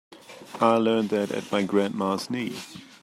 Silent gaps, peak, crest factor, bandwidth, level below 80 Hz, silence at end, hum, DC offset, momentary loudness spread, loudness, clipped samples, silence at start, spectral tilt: none; -6 dBFS; 20 dB; 15 kHz; -72 dBFS; 0.15 s; none; under 0.1%; 18 LU; -25 LUFS; under 0.1%; 0.1 s; -5.5 dB/octave